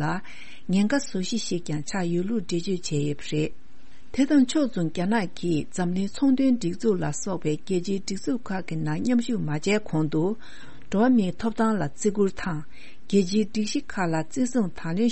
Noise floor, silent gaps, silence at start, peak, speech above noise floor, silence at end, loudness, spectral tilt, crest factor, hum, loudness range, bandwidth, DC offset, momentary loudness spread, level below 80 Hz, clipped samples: -51 dBFS; none; 0 s; -10 dBFS; 26 dB; 0 s; -26 LUFS; -6 dB/octave; 16 dB; none; 3 LU; 8.8 kHz; 3%; 8 LU; -54 dBFS; under 0.1%